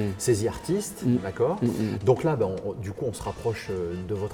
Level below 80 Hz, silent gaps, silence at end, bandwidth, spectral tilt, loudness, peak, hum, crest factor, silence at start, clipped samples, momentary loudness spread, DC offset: -52 dBFS; none; 0 s; over 20 kHz; -6.5 dB/octave; -27 LUFS; -8 dBFS; none; 20 dB; 0 s; under 0.1%; 8 LU; under 0.1%